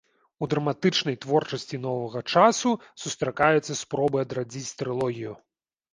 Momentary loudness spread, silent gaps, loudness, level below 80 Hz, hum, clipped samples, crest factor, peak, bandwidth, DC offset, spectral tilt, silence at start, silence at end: 12 LU; none; -26 LUFS; -64 dBFS; none; under 0.1%; 22 dB; -4 dBFS; 10.5 kHz; under 0.1%; -4.5 dB/octave; 0.4 s; 0.55 s